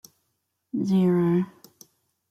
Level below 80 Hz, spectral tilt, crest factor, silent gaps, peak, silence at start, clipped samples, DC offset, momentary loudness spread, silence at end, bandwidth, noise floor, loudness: -68 dBFS; -8.5 dB/octave; 14 dB; none; -12 dBFS; 0.75 s; under 0.1%; under 0.1%; 13 LU; 0.8 s; 14 kHz; -77 dBFS; -24 LUFS